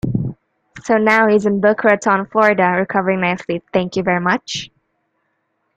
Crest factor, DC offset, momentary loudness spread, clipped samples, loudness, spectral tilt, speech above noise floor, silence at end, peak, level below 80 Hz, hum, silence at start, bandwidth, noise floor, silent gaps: 16 dB; under 0.1%; 12 LU; under 0.1%; -16 LUFS; -6 dB/octave; 53 dB; 1.1 s; -2 dBFS; -50 dBFS; none; 0.05 s; 9.2 kHz; -68 dBFS; none